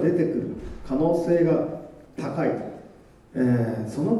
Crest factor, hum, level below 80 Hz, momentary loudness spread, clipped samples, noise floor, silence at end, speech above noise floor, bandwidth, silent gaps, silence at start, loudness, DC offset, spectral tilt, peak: 14 dB; none; -48 dBFS; 17 LU; under 0.1%; -49 dBFS; 0 s; 26 dB; 12 kHz; none; 0 s; -25 LUFS; under 0.1%; -9 dB/octave; -10 dBFS